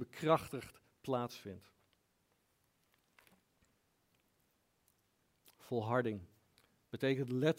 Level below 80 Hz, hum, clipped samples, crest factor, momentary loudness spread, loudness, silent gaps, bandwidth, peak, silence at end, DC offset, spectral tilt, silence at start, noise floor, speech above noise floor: -78 dBFS; none; under 0.1%; 24 dB; 18 LU; -38 LUFS; none; 16 kHz; -18 dBFS; 0.05 s; under 0.1%; -6.5 dB/octave; 0 s; -78 dBFS; 41 dB